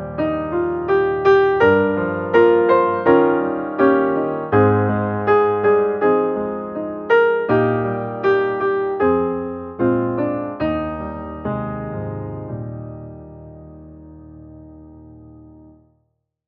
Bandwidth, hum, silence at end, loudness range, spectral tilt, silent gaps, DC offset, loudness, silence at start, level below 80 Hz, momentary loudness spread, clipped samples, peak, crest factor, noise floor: 5.4 kHz; none; 1 s; 15 LU; -6 dB/octave; none; under 0.1%; -18 LUFS; 0 s; -48 dBFS; 14 LU; under 0.1%; 0 dBFS; 18 dB; -69 dBFS